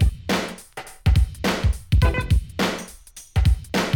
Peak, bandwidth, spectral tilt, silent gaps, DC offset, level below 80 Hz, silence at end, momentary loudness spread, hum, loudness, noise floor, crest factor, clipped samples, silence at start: -6 dBFS; 17.5 kHz; -5.5 dB/octave; none; under 0.1%; -24 dBFS; 0 s; 15 LU; none; -23 LUFS; -43 dBFS; 14 dB; under 0.1%; 0 s